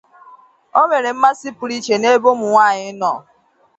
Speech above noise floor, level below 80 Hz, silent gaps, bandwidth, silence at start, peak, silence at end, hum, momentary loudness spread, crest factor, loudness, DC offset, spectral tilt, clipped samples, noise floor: 31 dB; -68 dBFS; none; 8.2 kHz; 0.75 s; 0 dBFS; 0.6 s; none; 11 LU; 16 dB; -16 LUFS; under 0.1%; -3.5 dB/octave; under 0.1%; -46 dBFS